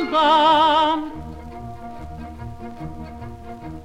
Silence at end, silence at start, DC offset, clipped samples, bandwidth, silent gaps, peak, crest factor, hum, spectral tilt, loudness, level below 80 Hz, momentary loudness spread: 0 s; 0 s; under 0.1%; under 0.1%; 11 kHz; none; -6 dBFS; 14 dB; none; -5 dB/octave; -16 LUFS; -44 dBFS; 22 LU